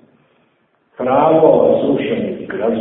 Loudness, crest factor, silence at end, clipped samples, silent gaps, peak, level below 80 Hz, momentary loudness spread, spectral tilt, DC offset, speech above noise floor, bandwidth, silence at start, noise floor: -14 LUFS; 16 dB; 0 s; under 0.1%; none; 0 dBFS; -54 dBFS; 11 LU; -12 dB/octave; under 0.1%; 46 dB; 4 kHz; 1 s; -60 dBFS